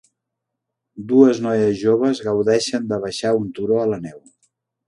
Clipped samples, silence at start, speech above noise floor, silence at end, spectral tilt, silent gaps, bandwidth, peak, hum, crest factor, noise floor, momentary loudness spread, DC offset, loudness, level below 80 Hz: under 0.1%; 0.95 s; 63 dB; 0.7 s; -5.5 dB/octave; none; 11.5 kHz; 0 dBFS; none; 20 dB; -81 dBFS; 10 LU; under 0.1%; -18 LUFS; -58 dBFS